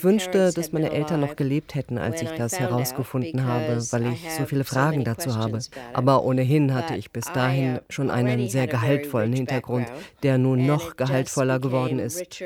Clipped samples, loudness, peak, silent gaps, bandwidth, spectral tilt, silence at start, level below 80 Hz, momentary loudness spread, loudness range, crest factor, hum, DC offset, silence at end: under 0.1%; -24 LUFS; -6 dBFS; none; 16.5 kHz; -6 dB/octave; 0 s; -58 dBFS; 8 LU; 3 LU; 18 dB; none; under 0.1%; 0 s